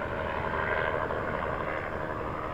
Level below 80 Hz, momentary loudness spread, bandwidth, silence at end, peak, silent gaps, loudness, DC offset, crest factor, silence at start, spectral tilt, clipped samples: -46 dBFS; 5 LU; over 20 kHz; 0 s; -16 dBFS; none; -31 LUFS; under 0.1%; 16 dB; 0 s; -7 dB/octave; under 0.1%